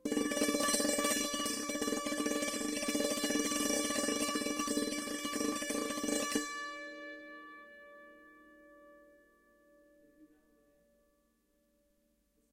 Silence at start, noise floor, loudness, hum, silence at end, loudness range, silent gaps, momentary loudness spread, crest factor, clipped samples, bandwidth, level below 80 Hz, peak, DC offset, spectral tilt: 0.05 s; -75 dBFS; -34 LUFS; none; 2.25 s; 16 LU; none; 18 LU; 20 dB; under 0.1%; 16 kHz; -66 dBFS; -16 dBFS; under 0.1%; -1.5 dB/octave